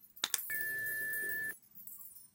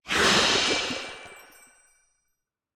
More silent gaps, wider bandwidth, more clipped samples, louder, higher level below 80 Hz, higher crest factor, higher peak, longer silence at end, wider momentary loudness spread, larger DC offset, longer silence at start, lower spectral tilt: neither; second, 17 kHz vs 19.5 kHz; neither; second, -36 LUFS vs -22 LUFS; second, -82 dBFS vs -54 dBFS; first, 32 dB vs 18 dB; about the same, -8 dBFS vs -8 dBFS; second, 0.05 s vs 1.35 s; second, 14 LU vs 19 LU; neither; about the same, 0 s vs 0.05 s; second, 1 dB/octave vs -1.5 dB/octave